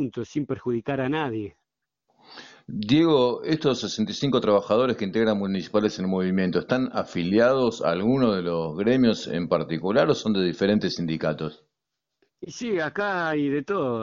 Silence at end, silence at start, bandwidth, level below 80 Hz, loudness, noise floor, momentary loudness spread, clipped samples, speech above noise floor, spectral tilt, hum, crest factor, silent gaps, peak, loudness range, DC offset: 0 s; 0 s; 7.6 kHz; -58 dBFS; -24 LUFS; -84 dBFS; 9 LU; under 0.1%; 60 dB; -6 dB/octave; none; 18 dB; none; -6 dBFS; 4 LU; under 0.1%